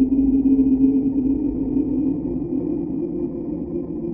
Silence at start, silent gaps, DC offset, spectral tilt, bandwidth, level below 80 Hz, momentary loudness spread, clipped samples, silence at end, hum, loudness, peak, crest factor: 0 s; none; under 0.1%; -13.5 dB/octave; 2.6 kHz; -38 dBFS; 10 LU; under 0.1%; 0 s; none; -21 LUFS; -6 dBFS; 14 dB